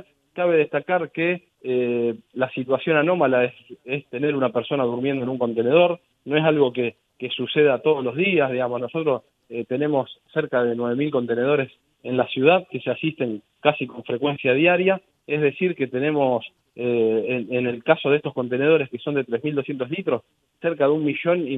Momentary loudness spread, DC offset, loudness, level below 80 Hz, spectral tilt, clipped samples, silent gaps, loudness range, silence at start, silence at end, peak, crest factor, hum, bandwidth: 10 LU; under 0.1%; -22 LUFS; -70 dBFS; -9 dB/octave; under 0.1%; none; 2 LU; 0.35 s; 0 s; -2 dBFS; 20 dB; none; 4 kHz